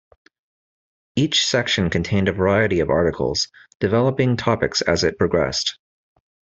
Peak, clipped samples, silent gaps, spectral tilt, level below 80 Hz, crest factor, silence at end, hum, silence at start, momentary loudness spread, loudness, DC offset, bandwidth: -4 dBFS; under 0.1%; 3.75-3.80 s; -4.5 dB/octave; -46 dBFS; 18 dB; 0.85 s; none; 1.15 s; 6 LU; -20 LUFS; under 0.1%; 8.2 kHz